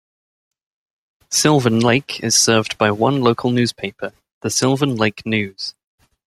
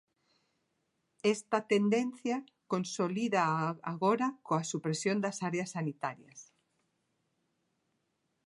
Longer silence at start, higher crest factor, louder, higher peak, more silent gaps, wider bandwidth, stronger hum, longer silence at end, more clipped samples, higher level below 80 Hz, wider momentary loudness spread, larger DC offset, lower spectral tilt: about the same, 1.3 s vs 1.25 s; about the same, 18 dB vs 20 dB; first, -17 LUFS vs -33 LUFS; first, -2 dBFS vs -14 dBFS; first, 4.32-4.41 s vs none; first, 14 kHz vs 11.5 kHz; neither; second, 0.6 s vs 2.05 s; neither; first, -56 dBFS vs -82 dBFS; first, 14 LU vs 8 LU; neither; about the same, -4 dB/octave vs -5 dB/octave